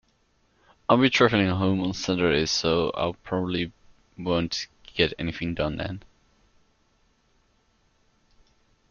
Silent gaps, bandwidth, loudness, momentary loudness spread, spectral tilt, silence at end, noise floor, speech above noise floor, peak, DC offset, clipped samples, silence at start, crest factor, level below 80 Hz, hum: none; 7.2 kHz; -25 LUFS; 14 LU; -5 dB/octave; 2.9 s; -66 dBFS; 42 dB; -4 dBFS; under 0.1%; under 0.1%; 0.9 s; 24 dB; -50 dBFS; none